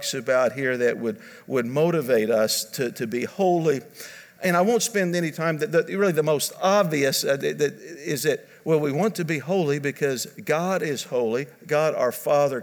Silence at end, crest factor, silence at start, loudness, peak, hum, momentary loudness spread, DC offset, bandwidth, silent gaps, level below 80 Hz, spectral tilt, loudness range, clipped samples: 0 s; 16 dB; 0 s; -23 LUFS; -8 dBFS; none; 8 LU; under 0.1%; over 20 kHz; none; -76 dBFS; -4.5 dB/octave; 2 LU; under 0.1%